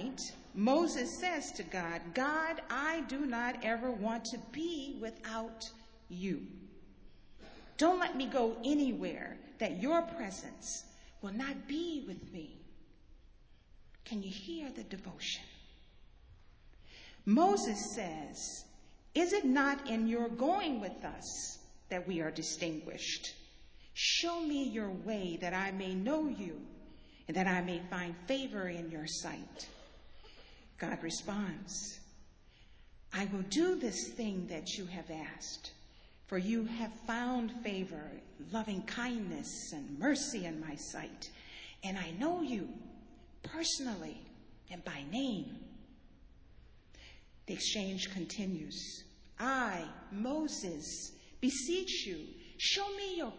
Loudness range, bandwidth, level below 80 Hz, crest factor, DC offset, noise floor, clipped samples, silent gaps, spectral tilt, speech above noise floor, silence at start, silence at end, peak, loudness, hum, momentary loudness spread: 9 LU; 8 kHz; -62 dBFS; 20 dB; under 0.1%; -60 dBFS; under 0.1%; none; -3.5 dB/octave; 23 dB; 0 s; 0 s; -18 dBFS; -37 LUFS; none; 16 LU